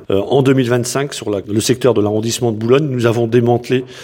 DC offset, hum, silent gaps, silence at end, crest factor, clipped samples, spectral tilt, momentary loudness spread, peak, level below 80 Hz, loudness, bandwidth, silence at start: under 0.1%; none; none; 0 s; 14 dB; under 0.1%; -5.5 dB/octave; 6 LU; 0 dBFS; -54 dBFS; -15 LUFS; 17 kHz; 0 s